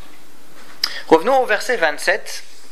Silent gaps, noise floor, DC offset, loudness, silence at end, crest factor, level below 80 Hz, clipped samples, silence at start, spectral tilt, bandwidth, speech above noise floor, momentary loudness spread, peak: none; -47 dBFS; 5%; -18 LUFS; 0.3 s; 20 dB; -60 dBFS; under 0.1%; 0.7 s; -2.5 dB/octave; 16 kHz; 30 dB; 11 LU; 0 dBFS